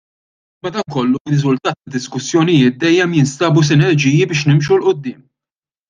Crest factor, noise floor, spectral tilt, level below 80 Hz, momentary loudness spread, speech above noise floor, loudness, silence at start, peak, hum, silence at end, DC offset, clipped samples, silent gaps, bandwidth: 14 dB; under -90 dBFS; -6 dB/octave; -54 dBFS; 11 LU; over 76 dB; -14 LUFS; 0.65 s; -2 dBFS; none; 0.75 s; under 0.1%; under 0.1%; 1.20-1.25 s; 9.4 kHz